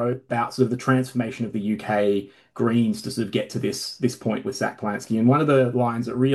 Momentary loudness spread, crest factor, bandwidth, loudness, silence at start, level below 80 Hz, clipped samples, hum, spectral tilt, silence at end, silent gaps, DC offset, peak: 8 LU; 16 dB; 12.5 kHz; -23 LUFS; 0 s; -64 dBFS; under 0.1%; none; -6.5 dB/octave; 0 s; none; under 0.1%; -6 dBFS